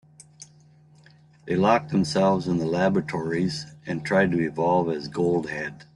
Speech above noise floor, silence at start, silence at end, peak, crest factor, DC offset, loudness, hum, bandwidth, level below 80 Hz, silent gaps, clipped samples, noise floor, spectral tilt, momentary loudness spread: 31 dB; 0.4 s; 0.15 s; -6 dBFS; 20 dB; under 0.1%; -24 LUFS; none; 11.5 kHz; -58 dBFS; none; under 0.1%; -54 dBFS; -6.5 dB/octave; 10 LU